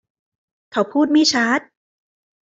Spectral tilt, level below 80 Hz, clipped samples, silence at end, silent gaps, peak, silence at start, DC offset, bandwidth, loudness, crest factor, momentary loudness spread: -2.5 dB/octave; -66 dBFS; under 0.1%; 0.9 s; none; -4 dBFS; 0.75 s; under 0.1%; 7.8 kHz; -18 LUFS; 18 dB; 8 LU